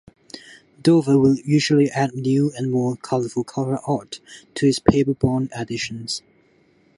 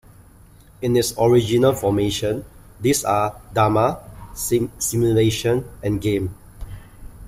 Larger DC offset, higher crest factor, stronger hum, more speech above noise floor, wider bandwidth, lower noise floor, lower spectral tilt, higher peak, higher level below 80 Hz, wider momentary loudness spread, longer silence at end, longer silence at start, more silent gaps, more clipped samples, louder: neither; about the same, 20 dB vs 16 dB; neither; first, 38 dB vs 28 dB; second, 11.5 kHz vs 16 kHz; first, -58 dBFS vs -48 dBFS; about the same, -6 dB/octave vs -5.5 dB/octave; first, 0 dBFS vs -4 dBFS; second, -48 dBFS vs -42 dBFS; about the same, 18 LU vs 17 LU; first, 0.8 s vs 0 s; second, 0.35 s vs 0.8 s; neither; neither; about the same, -20 LUFS vs -20 LUFS